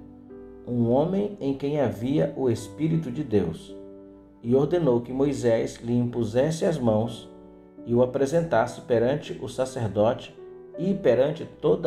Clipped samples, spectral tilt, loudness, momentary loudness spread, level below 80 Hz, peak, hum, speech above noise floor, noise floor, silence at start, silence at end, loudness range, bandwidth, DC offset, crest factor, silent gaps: under 0.1%; -7.5 dB/octave; -25 LUFS; 18 LU; -54 dBFS; -10 dBFS; none; 23 dB; -47 dBFS; 0 s; 0 s; 2 LU; 13.5 kHz; under 0.1%; 16 dB; none